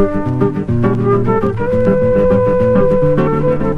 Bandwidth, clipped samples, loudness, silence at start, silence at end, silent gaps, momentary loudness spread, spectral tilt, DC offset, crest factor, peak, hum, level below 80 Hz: 5.8 kHz; under 0.1%; -13 LUFS; 0 s; 0 s; none; 4 LU; -10 dB/octave; under 0.1%; 12 dB; 0 dBFS; none; -28 dBFS